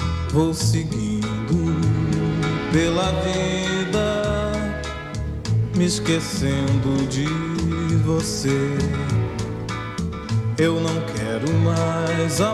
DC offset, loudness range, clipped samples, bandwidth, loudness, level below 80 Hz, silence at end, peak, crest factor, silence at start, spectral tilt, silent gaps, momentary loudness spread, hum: under 0.1%; 2 LU; under 0.1%; 13.5 kHz; -22 LUFS; -36 dBFS; 0 s; -6 dBFS; 16 dB; 0 s; -5.5 dB/octave; none; 7 LU; none